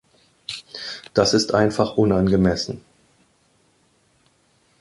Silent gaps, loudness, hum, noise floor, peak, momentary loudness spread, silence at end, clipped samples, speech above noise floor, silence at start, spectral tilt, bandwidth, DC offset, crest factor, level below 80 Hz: none; -20 LUFS; none; -62 dBFS; -2 dBFS; 16 LU; 2 s; under 0.1%; 43 dB; 0.5 s; -5 dB/octave; 11.5 kHz; under 0.1%; 20 dB; -44 dBFS